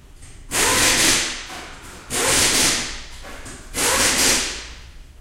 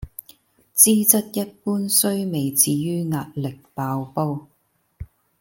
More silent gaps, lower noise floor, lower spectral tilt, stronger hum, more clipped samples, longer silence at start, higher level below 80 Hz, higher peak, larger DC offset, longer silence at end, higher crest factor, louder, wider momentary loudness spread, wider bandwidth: neither; second, -40 dBFS vs -53 dBFS; second, -0.5 dB/octave vs -4 dB/octave; neither; neither; first, 0.15 s vs 0 s; first, -38 dBFS vs -52 dBFS; about the same, -2 dBFS vs 0 dBFS; neither; second, 0.2 s vs 0.35 s; about the same, 20 dB vs 22 dB; about the same, -17 LUFS vs -19 LUFS; first, 22 LU vs 16 LU; about the same, 16 kHz vs 17 kHz